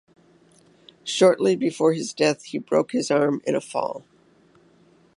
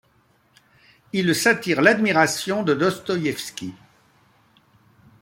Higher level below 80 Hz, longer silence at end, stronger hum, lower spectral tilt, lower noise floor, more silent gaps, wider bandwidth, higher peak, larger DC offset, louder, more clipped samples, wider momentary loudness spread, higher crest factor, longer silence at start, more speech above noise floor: second, -74 dBFS vs -64 dBFS; second, 1.2 s vs 1.5 s; neither; about the same, -4.5 dB/octave vs -4 dB/octave; second, -57 dBFS vs -61 dBFS; neither; second, 11.5 kHz vs 16.5 kHz; second, -6 dBFS vs -2 dBFS; neither; about the same, -22 LUFS vs -20 LUFS; neither; about the same, 12 LU vs 14 LU; about the same, 18 dB vs 22 dB; about the same, 1.05 s vs 1.15 s; second, 35 dB vs 41 dB